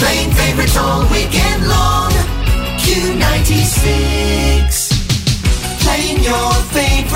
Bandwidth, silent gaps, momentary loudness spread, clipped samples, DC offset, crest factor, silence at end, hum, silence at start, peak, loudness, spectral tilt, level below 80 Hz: 16.5 kHz; none; 3 LU; under 0.1%; under 0.1%; 10 dB; 0 s; none; 0 s; -2 dBFS; -13 LUFS; -4 dB/octave; -16 dBFS